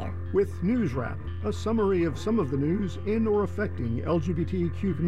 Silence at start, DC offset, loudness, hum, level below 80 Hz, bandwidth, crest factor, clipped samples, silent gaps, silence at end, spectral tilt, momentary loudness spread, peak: 0 s; 0.9%; -28 LUFS; none; -44 dBFS; 11.5 kHz; 12 dB; under 0.1%; none; 0 s; -8.5 dB/octave; 6 LU; -14 dBFS